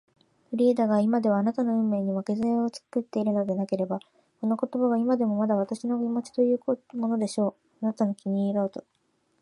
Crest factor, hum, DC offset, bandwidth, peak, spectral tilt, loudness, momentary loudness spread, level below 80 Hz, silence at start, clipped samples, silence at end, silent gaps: 14 dB; none; under 0.1%; 11.5 kHz; -12 dBFS; -8 dB/octave; -27 LUFS; 8 LU; -74 dBFS; 0.5 s; under 0.1%; 0.6 s; none